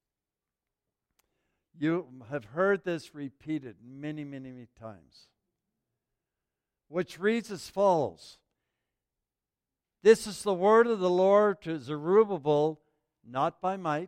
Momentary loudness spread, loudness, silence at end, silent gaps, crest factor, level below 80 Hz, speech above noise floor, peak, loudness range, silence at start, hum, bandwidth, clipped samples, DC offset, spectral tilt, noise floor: 19 LU; -28 LUFS; 0 s; none; 22 dB; -72 dBFS; over 62 dB; -8 dBFS; 17 LU; 1.8 s; none; 14.5 kHz; under 0.1%; under 0.1%; -6 dB/octave; under -90 dBFS